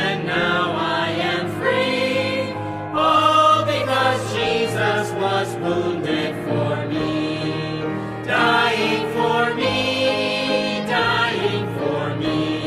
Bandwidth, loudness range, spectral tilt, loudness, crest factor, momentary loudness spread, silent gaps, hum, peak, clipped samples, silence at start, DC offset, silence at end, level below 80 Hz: 15 kHz; 3 LU; -5 dB/octave; -20 LUFS; 16 dB; 7 LU; none; none; -4 dBFS; under 0.1%; 0 s; under 0.1%; 0 s; -52 dBFS